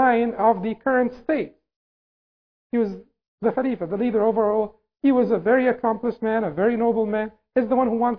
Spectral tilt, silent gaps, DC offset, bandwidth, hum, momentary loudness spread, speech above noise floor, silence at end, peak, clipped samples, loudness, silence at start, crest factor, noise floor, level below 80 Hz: -10 dB/octave; 1.76-2.70 s, 3.28-3.38 s; 0.1%; 5.4 kHz; none; 7 LU; over 69 dB; 0 s; -6 dBFS; under 0.1%; -22 LUFS; 0 s; 16 dB; under -90 dBFS; -58 dBFS